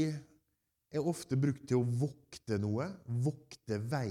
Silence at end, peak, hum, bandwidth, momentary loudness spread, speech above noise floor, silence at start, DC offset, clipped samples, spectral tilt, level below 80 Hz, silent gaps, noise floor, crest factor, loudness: 0 s; -20 dBFS; none; 14.5 kHz; 8 LU; 48 dB; 0 s; under 0.1%; under 0.1%; -7.5 dB/octave; -70 dBFS; none; -82 dBFS; 16 dB; -36 LUFS